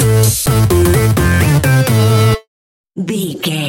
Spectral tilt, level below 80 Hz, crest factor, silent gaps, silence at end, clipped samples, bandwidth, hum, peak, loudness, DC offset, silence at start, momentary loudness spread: -5.5 dB/octave; -28 dBFS; 12 dB; 2.48-2.84 s; 0 s; under 0.1%; 17 kHz; none; 0 dBFS; -12 LUFS; under 0.1%; 0 s; 9 LU